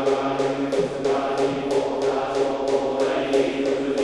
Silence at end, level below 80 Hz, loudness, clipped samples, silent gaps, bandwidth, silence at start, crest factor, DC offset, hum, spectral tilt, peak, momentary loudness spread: 0 s; -52 dBFS; -23 LUFS; under 0.1%; none; 11 kHz; 0 s; 14 dB; under 0.1%; none; -5 dB/octave; -8 dBFS; 2 LU